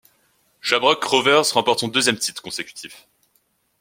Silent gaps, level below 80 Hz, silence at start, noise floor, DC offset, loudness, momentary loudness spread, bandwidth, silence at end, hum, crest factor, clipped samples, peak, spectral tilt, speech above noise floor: none; -66 dBFS; 0.65 s; -66 dBFS; under 0.1%; -19 LUFS; 16 LU; 16.5 kHz; 0.85 s; none; 20 dB; under 0.1%; 0 dBFS; -2 dB/octave; 46 dB